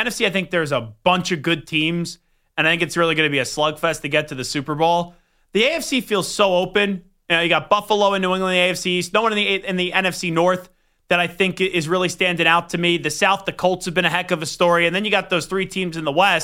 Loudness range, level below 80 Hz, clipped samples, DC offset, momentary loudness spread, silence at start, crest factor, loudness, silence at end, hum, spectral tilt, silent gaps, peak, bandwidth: 2 LU; -52 dBFS; under 0.1%; under 0.1%; 6 LU; 0 s; 18 dB; -19 LUFS; 0 s; none; -4 dB/octave; none; -2 dBFS; 16.5 kHz